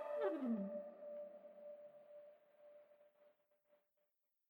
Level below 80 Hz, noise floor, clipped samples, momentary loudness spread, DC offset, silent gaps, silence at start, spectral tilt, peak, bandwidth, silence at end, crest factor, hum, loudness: under -90 dBFS; -87 dBFS; under 0.1%; 23 LU; under 0.1%; none; 0 s; -9 dB/octave; -30 dBFS; over 20 kHz; 1.2 s; 20 dB; none; -47 LUFS